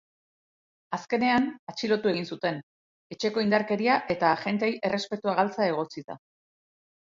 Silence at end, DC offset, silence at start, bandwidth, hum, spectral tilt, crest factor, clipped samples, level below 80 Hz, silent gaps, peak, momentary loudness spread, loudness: 0.95 s; under 0.1%; 0.9 s; 7.6 kHz; none; -5.5 dB/octave; 20 dB; under 0.1%; -68 dBFS; 1.59-1.67 s, 2.63-3.10 s, 6.04-6.08 s; -8 dBFS; 12 LU; -27 LUFS